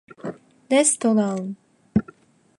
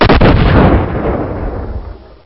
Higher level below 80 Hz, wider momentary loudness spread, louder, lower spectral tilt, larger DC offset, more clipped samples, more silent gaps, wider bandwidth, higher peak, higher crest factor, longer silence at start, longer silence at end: second, -54 dBFS vs -16 dBFS; about the same, 18 LU vs 17 LU; second, -21 LUFS vs -11 LUFS; second, -4.5 dB/octave vs -10 dB/octave; neither; second, under 0.1% vs 0.2%; neither; first, 11.5 kHz vs 5.8 kHz; second, -6 dBFS vs 0 dBFS; first, 18 dB vs 10 dB; first, 0.25 s vs 0 s; first, 0.55 s vs 0.2 s